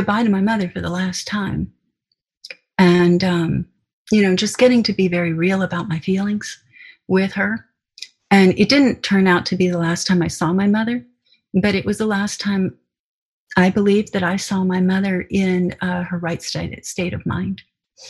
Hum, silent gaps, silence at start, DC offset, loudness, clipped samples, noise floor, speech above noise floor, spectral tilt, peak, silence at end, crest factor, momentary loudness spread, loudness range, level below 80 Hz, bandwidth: none; 2.37-2.41 s, 3.93-4.05 s, 12.99-13.47 s; 0 s; under 0.1%; -18 LUFS; under 0.1%; -74 dBFS; 56 dB; -5.5 dB/octave; -2 dBFS; 0 s; 18 dB; 12 LU; 4 LU; -48 dBFS; 12 kHz